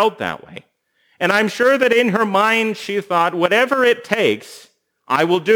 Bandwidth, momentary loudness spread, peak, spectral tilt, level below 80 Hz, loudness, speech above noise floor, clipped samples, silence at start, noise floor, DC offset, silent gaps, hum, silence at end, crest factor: over 20 kHz; 9 LU; 0 dBFS; -4.5 dB/octave; -68 dBFS; -17 LUFS; 46 dB; under 0.1%; 0 s; -62 dBFS; under 0.1%; none; none; 0 s; 16 dB